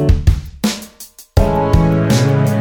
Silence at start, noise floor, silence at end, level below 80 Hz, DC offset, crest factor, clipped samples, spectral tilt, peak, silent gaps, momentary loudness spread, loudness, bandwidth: 0 s; -39 dBFS; 0 s; -20 dBFS; under 0.1%; 14 dB; under 0.1%; -6.5 dB/octave; 0 dBFS; none; 12 LU; -15 LUFS; 19.5 kHz